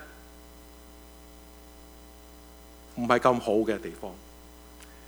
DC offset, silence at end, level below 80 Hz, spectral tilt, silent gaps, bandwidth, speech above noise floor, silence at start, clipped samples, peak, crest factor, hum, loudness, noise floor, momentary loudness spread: under 0.1%; 0 s; -52 dBFS; -5.5 dB/octave; none; over 20 kHz; 23 dB; 0 s; under 0.1%; -6 dBFS; 26 dB; none; -26 LUFS; -50 dBFS; 26 LU